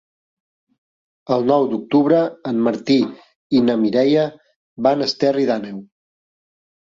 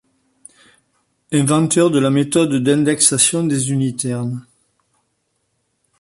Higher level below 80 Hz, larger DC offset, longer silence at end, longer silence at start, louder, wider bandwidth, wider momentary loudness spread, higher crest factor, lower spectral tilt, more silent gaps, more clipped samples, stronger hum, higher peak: second, -64 dBFS vs -58 dBFS; neither; second, 1.1 s vs 1.6 s; about the same, 1.3 s vs 1.3 s; about the same, -18 LUFS vs -16 LUFS; second, 7.6 kHz vs 12 kHz; about the same, 8 LU vs 10 LU; about the same, 16 dB vs 18 dB; first, -6.5 dB/octave vs -4.5 dB/octave; first, 3.35-3.50 s, 4.56-4.76 s vs none; neither; neither; about the same, -2 dBFS vs 0 dBFS